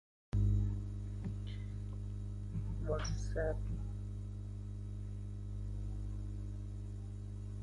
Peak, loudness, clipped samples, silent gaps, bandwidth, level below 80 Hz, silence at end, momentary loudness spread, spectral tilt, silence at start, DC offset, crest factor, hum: -24 dBFS; -42 LUFS; under 0.1%; none; 11 kHz; -44 dBFS; 0 s; 9 LU; -7 dB/octave; 0.35 s; under 0.1%; 14 dB; 50 Hz at -40 dBFS